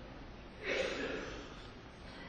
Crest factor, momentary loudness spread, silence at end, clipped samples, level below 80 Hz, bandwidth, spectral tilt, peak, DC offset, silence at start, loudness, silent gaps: 18 dB; 16 LU; 0 s; under 0.1%; -56 dBFS; 9 kHz; -4 dB/octave; -24 dBFS; under 0.1%; 0 s; -41 LUFS; none